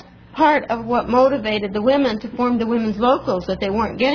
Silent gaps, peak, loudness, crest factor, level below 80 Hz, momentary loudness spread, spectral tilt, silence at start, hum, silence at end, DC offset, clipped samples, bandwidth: none; -4 dBFS; -19 LUFS; 16 dB; -44 dBFS; 6 LU; -6.5 dB/octave; 0.35 s; none; 0 s; under 0.1%; under 0.1%; 5.4 kHz